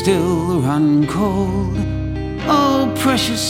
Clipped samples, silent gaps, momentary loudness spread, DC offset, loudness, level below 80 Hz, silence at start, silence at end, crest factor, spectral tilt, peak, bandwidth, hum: under 0.1%; none; 7 LU; under 0.1%; -17 LUFS; -32 dBFS; 0 s; 0 s; 14 dB; -5.5 dB/octave; -4 dBFS; 16.5 kHz; none